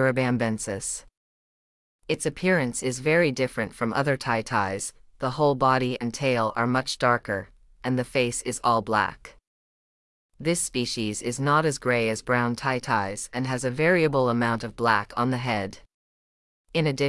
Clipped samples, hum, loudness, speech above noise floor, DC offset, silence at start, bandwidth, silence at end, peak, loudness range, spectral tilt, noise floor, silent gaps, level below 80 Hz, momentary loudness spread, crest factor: under 0.1%; none; -25 LUFS; over 65 dB; under 0.1%; 0 s; 12 kHz; 0 s; -6 dBFS; 3 LU; -4.5 dB/octave; under -90 dBFS; 1.17-1.99 s, 9.47-10.29 s, 15.94-16.65 s; -54 dBFS; 8 LU; 18 dB